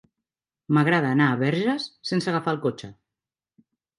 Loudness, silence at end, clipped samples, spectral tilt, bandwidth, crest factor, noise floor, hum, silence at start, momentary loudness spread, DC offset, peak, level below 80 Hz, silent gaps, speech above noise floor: -23 LUFS; 1.05 s; under 0.1%; -6.5 dB/octave; 11.5 kHz; 18 dB; -89 dBFS; none; 0.7 s; 9 LU; under 0.1%; -6 dBFS; -68 dBFS; none; 66 dB